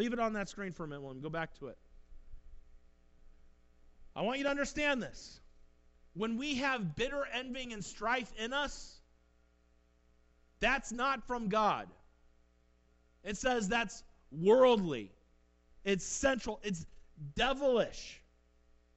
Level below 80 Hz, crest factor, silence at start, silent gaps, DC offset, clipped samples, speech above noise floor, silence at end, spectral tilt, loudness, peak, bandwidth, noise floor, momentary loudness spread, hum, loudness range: -54 dBFS; 20 dB; 0 s; none; under 0.1%; under 0.1%; 35 dB; 0.8 s; -4 dB/octave; -34 LUFS; -16 dBFS; 8.2 kHz; -69 dBFS; 18 LU; 60 Hz at -65 dBFS; 9 LU